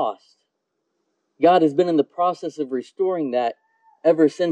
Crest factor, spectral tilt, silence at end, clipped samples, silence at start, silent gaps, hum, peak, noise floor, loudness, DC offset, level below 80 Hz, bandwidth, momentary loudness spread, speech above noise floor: 16 dB; -6.5 dB/octave; 0 s; under 0.1%; 0 s; none; none; -4 dBFS; -76 dBFS; -21 LUFS; under 0.1%; -76 dBFS; 9.2 kHz; 11 LU; 56 dB